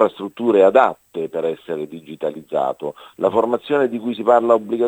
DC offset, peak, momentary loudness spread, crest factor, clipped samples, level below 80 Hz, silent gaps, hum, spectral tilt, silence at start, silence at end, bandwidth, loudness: under 0.1%; 0 dBFS; 14 LU; 18 dB; under 0.1%; -68 dBFS; none; none; -7 dB/octave; 0 s; 0 s; 9.2 kHz; -19 LUFS